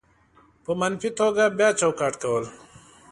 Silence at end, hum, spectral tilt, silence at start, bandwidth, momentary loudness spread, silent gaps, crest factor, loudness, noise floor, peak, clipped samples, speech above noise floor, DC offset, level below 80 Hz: 0.55 s; none; -4 dB/octave; 0.7 s; 11.5 kHz; 11 LU; none; 20 dB; -23 LUFS; -58 dBFS; -6 dBFS; under 0.1%; 35 dB; under 0.1%; -64 dBFS